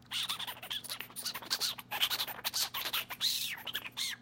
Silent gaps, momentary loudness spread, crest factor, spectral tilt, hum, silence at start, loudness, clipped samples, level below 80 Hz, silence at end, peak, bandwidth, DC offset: none; 7 LU; 24 dB; 0.5 dB/octave; none; 0 s; -34 LUFS; under 0.1%; -72 dBFS; 0 s; -14 dBFS; 17 kHz; under 0.1%